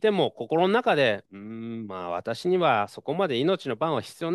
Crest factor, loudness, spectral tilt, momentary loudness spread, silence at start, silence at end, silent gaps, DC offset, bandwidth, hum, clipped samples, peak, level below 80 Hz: 16 dB; -26 LUFS; -6 dB/octave; 13 LU; 0 s; 0 s; none; under 0.1%; 12.5 kHz; none; under 0.1%; -10 dBFS; -74 dBFS